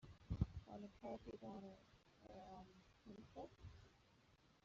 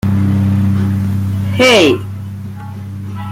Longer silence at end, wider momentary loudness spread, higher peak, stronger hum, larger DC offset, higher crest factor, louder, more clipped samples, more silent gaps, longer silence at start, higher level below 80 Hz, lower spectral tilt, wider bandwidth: about the same, 0.05 s vs 0 s; about the same, 19 LU vs 18 LU; second, -26 dBFS vs 0 dBFS; neither; neither; first, 28 dB vs 14 dB; second, -55 LUFS vs -12 LUFS; neither; neither; about the same, 0 s vs 0.05 s; second, -62 dBFS vs -44 dBFS; first, -8 dB/octave vs -6 dB/octave; second, 7.4 kHz vs 15.5 kHz